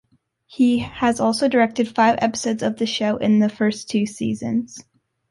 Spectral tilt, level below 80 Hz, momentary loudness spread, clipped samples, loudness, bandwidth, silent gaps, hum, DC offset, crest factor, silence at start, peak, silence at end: -5 dB/octave; -56 dBFS; 7 LU; under 0.1%; -20 LUFS; 11.5 kHz; none; none; under 0.1%; 16 dB; 0.5 s; -6 dBFS; 0.5 s